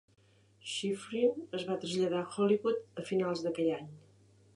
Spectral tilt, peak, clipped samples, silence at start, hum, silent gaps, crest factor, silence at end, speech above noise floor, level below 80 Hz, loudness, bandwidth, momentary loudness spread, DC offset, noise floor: -5.5 dB/octave; -18 dBFS; under 0.1%; 0.65 s; none; none; 16 dB; 0.55 s; 30 dB; -78 dBFS; -34 LUFS; 11.5 kHz; 9 LU; under 0.1%; -63 dBFS